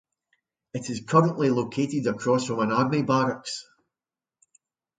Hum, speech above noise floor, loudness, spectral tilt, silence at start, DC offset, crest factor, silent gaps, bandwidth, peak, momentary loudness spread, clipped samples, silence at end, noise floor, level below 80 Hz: none; over 66 dB; -25 LUFS; -6 dB/octave; 0.75 s; under 0.1%; 22 dB; none; 9.4 kHz; -4 dBFS; 13 LU; under 0.1%; 1.35 s; under -90 dBFS; -66 dBFS